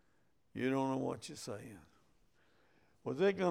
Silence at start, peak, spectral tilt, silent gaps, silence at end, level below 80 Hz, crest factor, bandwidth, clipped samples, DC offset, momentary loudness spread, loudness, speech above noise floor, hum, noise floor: 0.55 s; -20 dBFS; -6 dB/octave; none; 0 s; -76 dBFS; 18 dB; 15 kHz; under 0.1%; under 0.1%; 15 LU; -38 LUFS; 41 dB; none; -77 dBFS